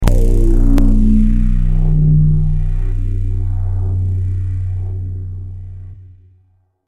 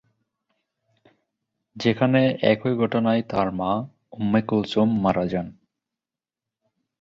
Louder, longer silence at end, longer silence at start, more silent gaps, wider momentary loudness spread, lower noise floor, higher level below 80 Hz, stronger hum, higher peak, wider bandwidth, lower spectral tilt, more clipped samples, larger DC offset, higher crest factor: first, -17 LUFS vs -22 LUFS; second, 0.85 s vs 1.5 s; second, 0 s vs 1.75 s; neither; first, 15 LU vs 9 LU; second, -55 dBFS vs under -90 dBFS; first, -14 dBFS vs -56 dBFS; neither; first, 0 dBFS vs -4 dBFS; second, 3.4 kHz vs 7.4 kHz; first, -9 dB/octave vs -7.5 dB/octave; neither; neither; second, 12 dB vs 20 dB